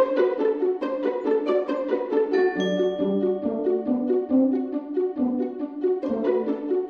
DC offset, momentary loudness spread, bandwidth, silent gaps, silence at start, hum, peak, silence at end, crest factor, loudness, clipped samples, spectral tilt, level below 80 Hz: under 0.1%; 5 LU; 6.6 kHz; none; 0 s; none; -10 dBFS; 0 s; 14 dB; -24 LUFS; under 0.1%; -7.5 dB/octave; -66 dBFS